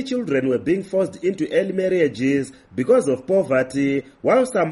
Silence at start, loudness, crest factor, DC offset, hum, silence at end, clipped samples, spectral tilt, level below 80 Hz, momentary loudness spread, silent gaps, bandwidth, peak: 0 s; -20 LUFS; 16 dB; under 0.1%; none; 0 s; under 0.1%; -6.5 dB/octave; -58 dBFS; 5 LU; none; 11.5 kHz; -4 dBFS